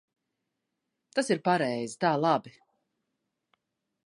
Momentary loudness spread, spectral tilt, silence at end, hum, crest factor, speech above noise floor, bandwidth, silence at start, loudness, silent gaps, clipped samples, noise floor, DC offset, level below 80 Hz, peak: 6 LU; -5 dB/octave; 1.55 s; none; 22 dB; 56 dB; 11.5 kHz; 1.15 s; -28 LUFS; none; under 0.1%; -83 dBFS; under 0.1%; -82 dBFS; -10 dBFS